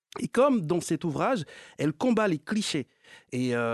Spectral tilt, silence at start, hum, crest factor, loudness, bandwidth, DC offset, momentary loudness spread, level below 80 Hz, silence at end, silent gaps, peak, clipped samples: -5.5 dB/octave; 0.15 s; none; 16 dB; -28 LUFS; 12.5 kHz; under 0.1%; 10 LU; -66 dBFS; 0 s; none; -10 dBFS; under 0.1%